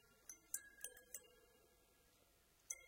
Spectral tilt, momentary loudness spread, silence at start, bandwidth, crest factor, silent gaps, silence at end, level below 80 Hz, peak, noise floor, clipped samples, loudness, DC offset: 0.5 dB/octave; 10 LU; 0 s; 17 kHz; 32 dB; none; 0 s; -82 dBFS; -26 dBFS; -75 dBFS; under 0.1%; -53 LUFS; under 0.1%